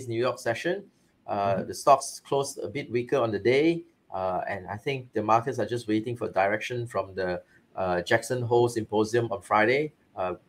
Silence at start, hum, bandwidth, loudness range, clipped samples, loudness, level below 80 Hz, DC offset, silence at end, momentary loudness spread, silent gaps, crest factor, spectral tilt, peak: 0 s; none; 16 kHz; 2 LU; under 0.1%; -27 LUFS; -66 dBFS; under 0.1%; 0.1 s; 10 LU; none; 22 dB; -5.5 dB/octave; -6 dBFS